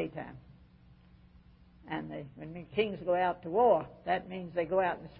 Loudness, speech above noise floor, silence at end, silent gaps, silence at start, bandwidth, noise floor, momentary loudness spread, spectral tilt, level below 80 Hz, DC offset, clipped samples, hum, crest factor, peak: -32 LUFS; 27 dB; 0 s; none; 0 s; 5.2 kHz; -59 dBFS; 18 LU; -4 dB/octave; -62 dBFS; under 0.1%; under 0.1%; none; 18 dB; -14 dBFS